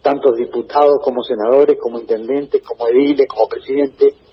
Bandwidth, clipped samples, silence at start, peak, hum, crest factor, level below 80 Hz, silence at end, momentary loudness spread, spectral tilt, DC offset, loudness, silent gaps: 5.8 kHz; under 0.1%; 0.05 s; 0 dBFS; none; 14 dB; -58 dBFS; 0.2 s; 7 LU; -7.5 dB/octave; under 0.1%; -15 LUFS; none